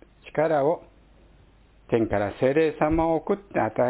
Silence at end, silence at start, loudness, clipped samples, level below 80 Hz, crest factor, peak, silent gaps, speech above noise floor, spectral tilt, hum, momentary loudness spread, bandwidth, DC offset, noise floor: 0 s; 0.25 s; -24 LUFS; under 0.1%; -46 dBFS; 18 dB; -8 dBFS; none; 32 dB; -11 dB/octave; none; 5 LU; 4 kHz; under 0.1%; -55 dBFS